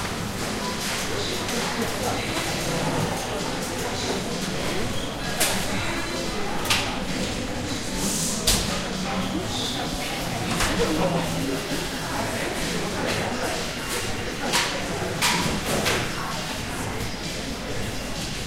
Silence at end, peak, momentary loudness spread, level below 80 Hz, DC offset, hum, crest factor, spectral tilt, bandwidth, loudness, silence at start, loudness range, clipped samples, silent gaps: 0 s; -6 dBFS; 6 LU; -40 dBFS; under 0.1%; none; 20 dB; -3 dB/octave; 16 kHz; -26 LUFS; 0 s; 2 LU; under 0.1%; none